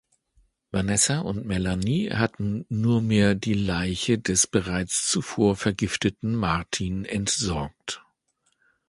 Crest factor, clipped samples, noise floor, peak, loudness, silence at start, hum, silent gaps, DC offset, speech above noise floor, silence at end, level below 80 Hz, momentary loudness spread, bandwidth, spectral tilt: 20 dB; under 0.1%; -72 dBFS; -6 dBFS; -24 LUFS; 0.75 s; none; none; under 0.1%; 47 dB; 0.9 s; -44 dBFS; 7 LU; 11.5 kHz; -4 dB/octave